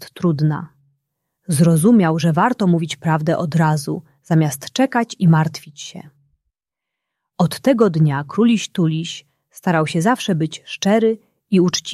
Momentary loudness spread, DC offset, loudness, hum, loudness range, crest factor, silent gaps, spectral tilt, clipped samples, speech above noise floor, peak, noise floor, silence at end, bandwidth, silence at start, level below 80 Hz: 14 LU; under 0.1%; -17 LUFS; none; 4 LU; 16 dB; none; -6 dB/octave; under 0.1%; 67 dB; -2 dBFS; -84 dBFS; 0 s; 13 kHz; 0 s; -60 dBFS